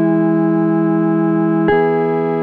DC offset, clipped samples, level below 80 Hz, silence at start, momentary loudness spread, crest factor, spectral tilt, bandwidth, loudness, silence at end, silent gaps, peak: under 0.1%; under 0.1%; -50 dBFS; 0 s; 2 LU; 10 dB; -11 dB/octave; 4.4 kHz; -15 LUFS; 0 s; none; -4 dBFS